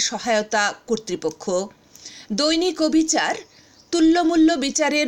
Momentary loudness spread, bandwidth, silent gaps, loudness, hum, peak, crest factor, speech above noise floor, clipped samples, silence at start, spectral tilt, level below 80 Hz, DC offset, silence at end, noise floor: 11 LU; 11.5 kHz; none; -20 LUFS; none; -6 dBFS; 14 dB; 23 dB; under 0.1%; 0 s; -2.5 dB/octave; -52 dBFS; under 0.1%; 0 s; -43 dBFS